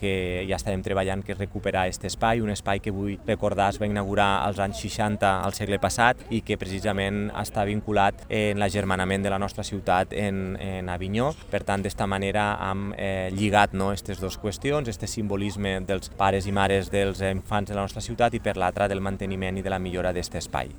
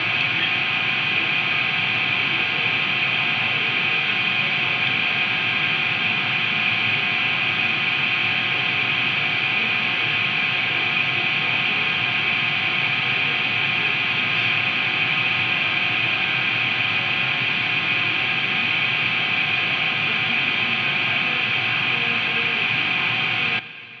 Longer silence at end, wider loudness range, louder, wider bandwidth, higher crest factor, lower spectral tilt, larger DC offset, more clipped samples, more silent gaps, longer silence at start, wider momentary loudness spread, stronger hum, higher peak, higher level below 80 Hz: about the same, 0 s vs 0 s; about the same, 2 LU vs 0 LU; second, -26 LUFS vs -19 LUFS; first, over 20 kHz vs 7.6 kHz; first, 24 dB vs 14 dB; about the same, -5 dB/octave vs -4 dB/octave; neither; neither; neither; about the same, 0 s vs 0 s; first, 7 LU vs 1 LU; neither; first, -2 dBFS vs -8 dBFS; first, -42 dBFS vs -68 dBFS